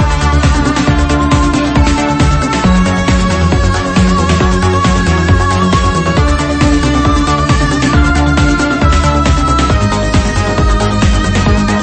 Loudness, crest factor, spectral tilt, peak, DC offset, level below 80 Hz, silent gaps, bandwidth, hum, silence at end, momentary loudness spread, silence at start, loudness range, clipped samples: -11 LUFS; 10 dB; -5.5 dB/octave; 0 dBFS; under 0.1%; -16 dBFS; none; 8.8 kHz; none; 0 s; 1 LU; 0 s; 0 LU; under 0.1%